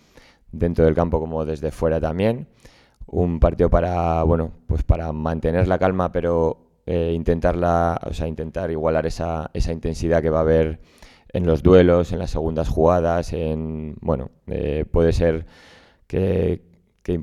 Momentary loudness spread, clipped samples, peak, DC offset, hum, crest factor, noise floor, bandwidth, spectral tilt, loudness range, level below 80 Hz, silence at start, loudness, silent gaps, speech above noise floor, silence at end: 10 LU; under 0.1%; 0 dBFS; under 0.1%; none; 20 dB; -51 dBFS; 11.5 kHz; -8 dB/octave; 4 LU; -32 dBFS; 0.55 s; -21 LUFS; none; 31 dB; 0 s